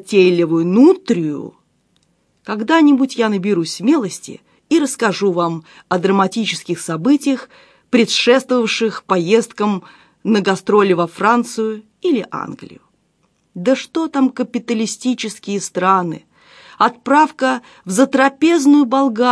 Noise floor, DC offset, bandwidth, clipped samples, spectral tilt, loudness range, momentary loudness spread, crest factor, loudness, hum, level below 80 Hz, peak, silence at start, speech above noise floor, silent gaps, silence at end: -62 dBFS; under 0.1%; 11 kHz; under 0.1%; -5 dB/octave; 5 LU; 12 LU; 16 dB; -16 LUFS; none; -66 dBFS; 0 dBFS; 0.05 s; 47 dB; none; 0 s